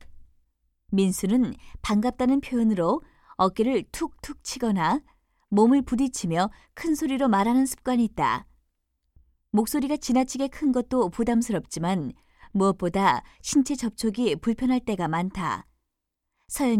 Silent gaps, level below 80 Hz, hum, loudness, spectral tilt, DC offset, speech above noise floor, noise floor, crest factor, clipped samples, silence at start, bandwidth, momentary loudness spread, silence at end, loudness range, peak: none; -50 dBFS; none; -25 LUFS; -5.5 dB/octave; under 0.1%; 58 dB; -82 dBFS; 18 dB; under 0.1%; 0.1 s; 16 kHz; 8 LU; 0 s; 3 LU; -8 dBFS